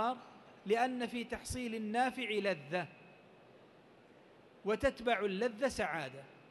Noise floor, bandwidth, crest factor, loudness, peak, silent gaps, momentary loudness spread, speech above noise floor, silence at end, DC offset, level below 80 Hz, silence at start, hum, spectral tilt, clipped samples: -62 dBFS; 12 kHz; 20 dB; -37 LUFS; -18 dBFS; none; 13 LU; 26 dB; 0.05 s; under 0.1%; -62 dBFS; 0 s; none; -4.5 dB/octave; under 0.1%